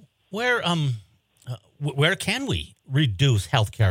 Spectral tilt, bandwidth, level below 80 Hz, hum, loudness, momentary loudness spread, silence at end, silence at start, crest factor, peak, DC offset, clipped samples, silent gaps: -5 dB/octave; 16.5 kHz; -52 dBFS; none; -23 LUFS; 15 LU; 0 s; 0.3 s; 20 dB; -4 dBFS; under 0.1%; under 0.1%; none